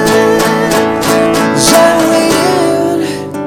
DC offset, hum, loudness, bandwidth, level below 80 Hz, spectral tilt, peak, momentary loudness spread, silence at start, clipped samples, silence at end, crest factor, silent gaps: under 0.1%; none; -9 LUFS; 19.5 kHz; -40 dBFS; -4 dB/octave; 0 dBFS; 6 LU; 0 s; 0.2%; 0 s; 10 dB; none